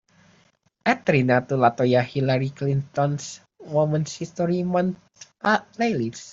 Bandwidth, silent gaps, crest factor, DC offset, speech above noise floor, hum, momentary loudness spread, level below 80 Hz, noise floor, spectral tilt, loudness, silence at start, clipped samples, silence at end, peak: 7.8 kHz; none; 20 dB; under 0.1%; 40 dB; none; 9 LU; -60 dBFS; -62 dBFS; -6.5 dB/octave; -23 LUFS; 0.85 s; under 0.1%; 0 s; -4 dBFS